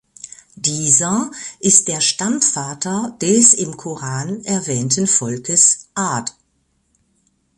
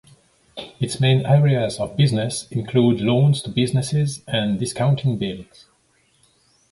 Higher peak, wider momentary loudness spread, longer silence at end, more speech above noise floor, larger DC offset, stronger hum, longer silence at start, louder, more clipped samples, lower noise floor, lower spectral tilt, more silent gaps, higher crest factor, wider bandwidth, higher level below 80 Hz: first, 0 dBFS vs -4 dBFS; first, 14 LU vs 11 LU; about the same, 1.3 s vs 1.3 s; first, 47 dB vs 42 dB; neither; neither; second, 0.25 s vs 0.55 s; first, -15 LUFS vs -20 LUFS; neither; first, -65 dBFS vs -61 dBFS; second, -3 dB/octave vs -6 dB/octave; neither; about the same, 18 dB vs 16 dB; about the same, 11.5 kHz vs 11.5 kHz; second, -58 dBFS vs -52 dBFS